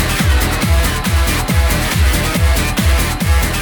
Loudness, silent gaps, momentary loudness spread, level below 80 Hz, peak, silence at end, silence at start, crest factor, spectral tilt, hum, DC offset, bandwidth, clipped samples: -14 LUFS; none; 1 LU; -16 dBFS; -2 dBFS; 0 s; 0 s; 10 dB; -4.5 dB/octave; none; under 0.1%; over 20 kHz; under 0.1%